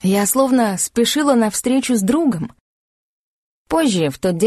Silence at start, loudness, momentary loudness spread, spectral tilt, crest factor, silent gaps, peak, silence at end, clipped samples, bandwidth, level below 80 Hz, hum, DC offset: 0.05 s; -17 LUFS; 5 LU; -4.5 dB/octave; 16 dB; 2.60-3.65 s; -2 dBFS; 0 s; under 0.1%; 13 kHz; -50 dBFS; none; under 0.1%